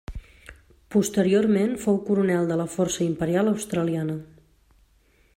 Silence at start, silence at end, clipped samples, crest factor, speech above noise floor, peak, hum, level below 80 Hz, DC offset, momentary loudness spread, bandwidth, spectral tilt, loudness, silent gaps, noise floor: 0.1 s; 1.1 s; under 0.1%; 16 dB; 38 dB; -8 dBFS; none; -48 dBFS; under 0.1%; 9 LU; 16 kHz; -6 dB/octave; -24 LUFS; none; -61 dBFS